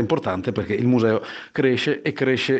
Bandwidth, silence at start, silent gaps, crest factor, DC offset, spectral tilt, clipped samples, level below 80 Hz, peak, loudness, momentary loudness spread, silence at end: 8.4 kHz; 0 s; none; 14 dB; under 0.1%; -6.5 dB/octave; under 0.1%; -60 dBFS; -6 dBFS; -22 LUFS; 6 LU; 0 s